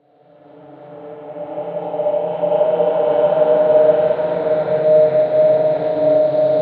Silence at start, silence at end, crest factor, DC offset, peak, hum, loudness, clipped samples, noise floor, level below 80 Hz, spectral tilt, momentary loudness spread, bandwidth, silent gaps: 0.7 s; 0 s; 14 dB; under 0.1%; -2 dBFS; none; -15 LUFS; under 0.1%; -48 dBFS; -66 dBFS; -9.5 dB/octave; 15 LU; 4.5 kHz; none